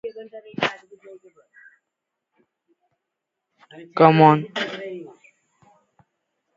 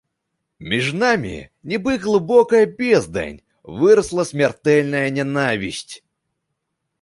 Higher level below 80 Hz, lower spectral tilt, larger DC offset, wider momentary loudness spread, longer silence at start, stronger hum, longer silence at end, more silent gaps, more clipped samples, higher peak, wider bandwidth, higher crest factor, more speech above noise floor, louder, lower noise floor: second, -68 dBFS vs -50 dBFS; first, -7.5 dB/octave vs -5.5 dB/octave; neither; first, 25 LU vs 16 LU; second, 0.05 s vs 0.6 s; neither; first, 1.55 s vs 1.05 s; neither; neither; about the same, 0 dBFS vs -2 dBFS; second, 7.6 kHz vs 11.5 kHz; first, 24 dB vs 18 dB; first, 64 dB vs 59 dB; about the same, -19 LUFS vs -18 LUFS; first, -82 dBFS vs -76 dBFS